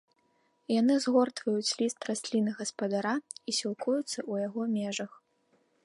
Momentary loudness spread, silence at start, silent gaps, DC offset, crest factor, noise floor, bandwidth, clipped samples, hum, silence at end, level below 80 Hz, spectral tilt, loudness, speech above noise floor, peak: 9 LU; 0.7 s; none; under 0.1%; 20 dB; -72 dBFS; 11.5 kHz; under 0.1%; none; 0.8 s; -84 dBFS; -4 dB/octave; -31 LUFS; 42 dB; -12 dBFS